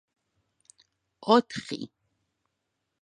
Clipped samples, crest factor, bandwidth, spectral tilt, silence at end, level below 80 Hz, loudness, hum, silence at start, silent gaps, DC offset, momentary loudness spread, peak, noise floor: under 0.1%; 26 dB; 10.5 kHz; -5 dB/octave; 1.15 s; -74 dBFS; -27 LUFS; none; 1.25 s; none; under 0.1%; 16 LU; -6 dBFS; -81 dBFS